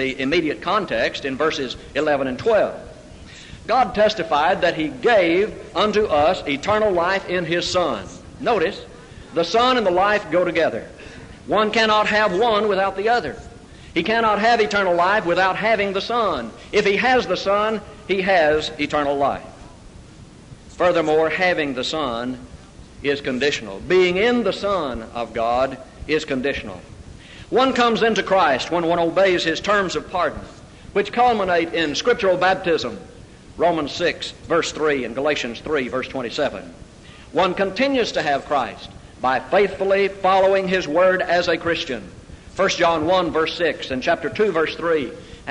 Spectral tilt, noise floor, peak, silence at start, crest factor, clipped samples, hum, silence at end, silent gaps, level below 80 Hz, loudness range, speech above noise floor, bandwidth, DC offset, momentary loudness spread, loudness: -4.5 dB/octave; -43 dBFS; -6 dBFS; 0 s; 14 dB; under 0.1%; none; 0 s; none; -46 dBFS; 4 LU; 23 dB; 11 kHz; under 0.1%; 11 LU; -20 LUFS